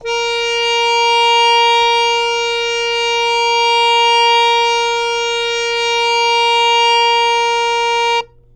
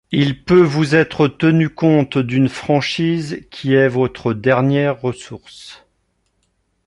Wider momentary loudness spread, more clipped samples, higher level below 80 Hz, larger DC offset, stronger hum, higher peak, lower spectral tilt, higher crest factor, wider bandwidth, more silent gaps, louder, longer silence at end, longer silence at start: second, 6 LU vs 13 LU; neither; about the same, -48 dBFS vs -50 dBFS; neither; neither; about the same, -4 dBFS vs -2 dBFS; second, 2 dB/octave vs -7 dB/octave; second, 10 dB vs 16 dB; about the same, 11.5 kHz vs 11 kHz; neither; first, -12 LUFS vs -16 LUFS; second, 0.3 s vs 1.1 s; about the same, 0 s vs 0.1 s